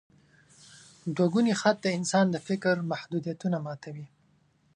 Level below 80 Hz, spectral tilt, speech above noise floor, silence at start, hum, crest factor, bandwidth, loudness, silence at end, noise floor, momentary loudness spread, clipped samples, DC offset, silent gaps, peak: -74 dBFS; -5.5 dB/octave; 39 dB; 0.7 s; none; 20 dB; 11 kHz; -28 LUFS; 0.7 s; -66 dBFS; 15 LU; under 0.1%; under 0.1%; none; -10 dBFS